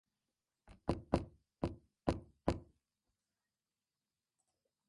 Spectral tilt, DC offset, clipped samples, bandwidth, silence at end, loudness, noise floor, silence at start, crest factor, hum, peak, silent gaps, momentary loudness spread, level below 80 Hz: -7.5 dB/octave; under 0.1%; under 0.1%; 11.5 kHz; 2.25 s; -42 LUFS; under -90 dBFS; 0.7 s; 30 dB; none; -16 dBFS; none; 6 LU; -54 dBFS